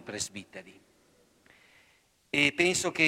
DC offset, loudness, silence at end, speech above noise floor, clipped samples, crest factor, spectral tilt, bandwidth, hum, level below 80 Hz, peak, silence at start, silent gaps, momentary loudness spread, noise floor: under 0.1%; -27 LUFS; 0 s; 37 dB; under 0.1%; 22 dB; -2.5 dB/octave; 16 kHz; none; -66 dBFS; -10 dBFS; 0.05 s; none; 23 LU; -66 dBFS